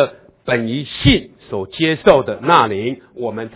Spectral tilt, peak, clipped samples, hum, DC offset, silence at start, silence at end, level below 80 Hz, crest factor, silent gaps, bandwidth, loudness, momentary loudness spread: -10 dB/octave; 0 dBFS; under 0.1%; none; under 0.1%; 0 s; 0.1 s; -36 dBFS; 16 dB; none; 4 kHz; -16 LUFS; 13 LU